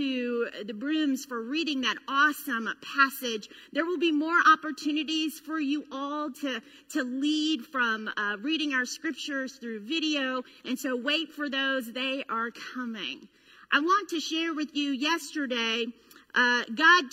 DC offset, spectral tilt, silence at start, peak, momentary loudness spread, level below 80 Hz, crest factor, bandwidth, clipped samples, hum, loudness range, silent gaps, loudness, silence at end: under 0.1%; -2 dB/octave; 0 s; -8 dBFS; 10 LU; -78 dBFS; 22 dB; 16 kHz; under 0.1%; none; 4 LU; none; -28 LUFS; 0.05 s